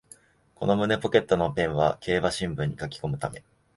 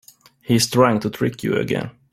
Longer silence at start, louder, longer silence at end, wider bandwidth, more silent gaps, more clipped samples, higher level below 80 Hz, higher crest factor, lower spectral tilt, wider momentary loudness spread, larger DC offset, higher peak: about the same, 0.6 s vs 0.5 s; second, -26 LUFS vs -20 LUFS; first, 0.35 s vs 0.2 s; second, 11.5 kHz vs 16 kHz; neither; neither; about the same, -50 dBFS vs -54 dBFS; first, 24 dB vs 18 dB; about the same, -6 dB/octave vs -5 dB/octave; about the same, 10 LU vs 9 LU; neither; about the same, -4 dBFS vs -2 dBFS